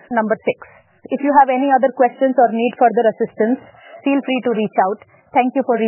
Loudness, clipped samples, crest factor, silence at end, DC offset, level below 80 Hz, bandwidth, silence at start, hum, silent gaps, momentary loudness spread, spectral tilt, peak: -17 LUFS; under 0.1%; 16 dB; 0 s; under 0.1%; -68 dBFS; 3.2 kHz; 0.1 s; none; none; 10 LU; -9.5 dB/octave; 0 dBFS